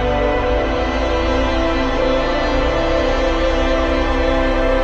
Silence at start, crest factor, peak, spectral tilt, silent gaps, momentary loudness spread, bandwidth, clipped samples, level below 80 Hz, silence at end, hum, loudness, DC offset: 0 s; 12 dB; -4 dBFS; -6 dB/octave; none; 1 LU; 7.8 kHz; under 0.1%; -22 dBFS; 0 s; none; -17 LUFS; under 0.1%